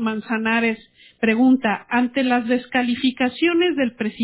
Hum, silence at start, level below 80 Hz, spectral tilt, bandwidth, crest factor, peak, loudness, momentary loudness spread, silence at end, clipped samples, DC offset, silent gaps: none; 0 s; -60 dBFS; -9 dB/octave; 4 kHz; 14 dB; -6 dBFS; -20 LUFS; 6 LU; 0 s; under 0.1%; under 0.1%; none